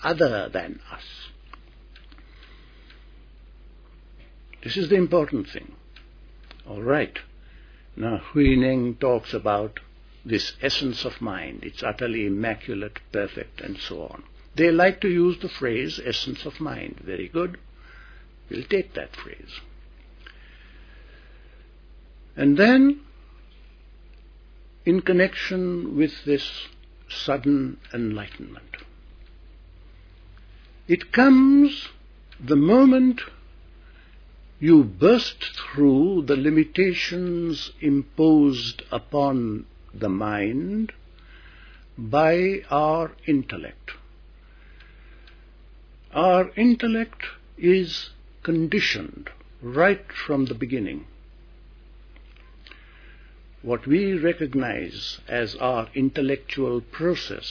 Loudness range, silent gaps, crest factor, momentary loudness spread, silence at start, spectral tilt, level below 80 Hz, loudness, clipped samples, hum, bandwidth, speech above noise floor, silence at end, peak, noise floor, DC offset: 11 LU; none; 20 dB; 20 LU; 0 s; -6.5 dB/octave; -46 dBFS; -22 LUFS; under 0.1%; none; 5.4 kHz; 26 dB; 0 s; -4 dBFS; -48 dBFS; under 0.1%